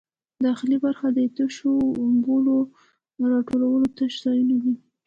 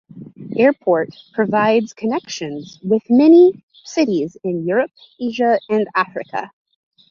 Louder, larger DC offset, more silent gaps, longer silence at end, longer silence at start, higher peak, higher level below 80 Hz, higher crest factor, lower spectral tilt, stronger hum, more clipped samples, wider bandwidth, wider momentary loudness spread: second, -23 LUFS vs -17 LUFS; neither; second, none vs 3.63-3.68 s; second, 0.3 s vs 0.65 s; first, 0.4 s vs 0.15 s; second, -12 dBFS vs -2 dBFS; about the same, -64 dBFS vs -66 dBFS; second, 10 dB vs 16 dB; about the same, -6 dB/octave vs -6 dB/octave; neither; neither; about the same, 7.4 kHz vs 7.2 kHz; second, 5 LU vs 16 LU